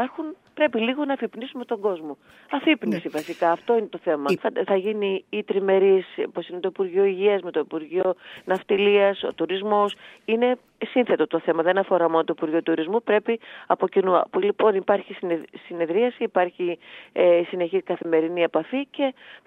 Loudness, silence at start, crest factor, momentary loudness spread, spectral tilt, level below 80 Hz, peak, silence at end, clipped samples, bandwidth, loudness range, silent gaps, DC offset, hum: -23 LUFS; 0 s; 20 dB; 10 LU; -6.5 dB/octave; -76 dBFS; -4 dBFS; 0.1 s; under 0.1%; 8.6 kHz; 2 LU; none; under 0.1%; none